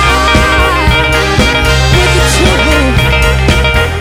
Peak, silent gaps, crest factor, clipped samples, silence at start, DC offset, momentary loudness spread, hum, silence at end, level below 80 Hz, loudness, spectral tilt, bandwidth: 0 dBFS; none; 8 dB; under 0.1%; 0 s; under 0.1%; 1 LU; none; 0 s; -14 dBFS; -8 LUFS; -4.5 dB/octave; 16 kHz